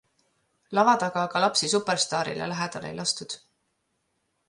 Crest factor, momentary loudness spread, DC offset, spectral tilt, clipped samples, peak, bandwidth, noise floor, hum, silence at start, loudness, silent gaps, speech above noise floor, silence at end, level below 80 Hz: 20 dB; 10 LU; under 0.1%; -3 dB/octave; under 0.1%; -8 dBFS; 11.5 kHz; -75 dBFS; none; 0.7 s; -25 LUFS; none; 50 dB; 1.1 s; -70 dBFS